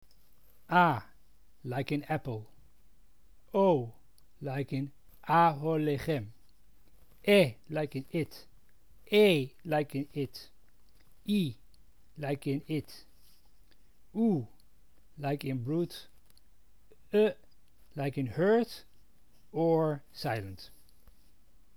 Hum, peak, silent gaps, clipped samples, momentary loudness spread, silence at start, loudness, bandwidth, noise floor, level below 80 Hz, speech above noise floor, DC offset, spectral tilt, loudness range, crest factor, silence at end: none; -12 dBFS; none; under 0.1%; 20 LU; 0.7 s; -31 LUFS; over 20 kHz; -66 dBFS; -64 dBFS; 36 dB; 0.2%; -7 dB/octave; 7 LU; 22 dB; 1.1 s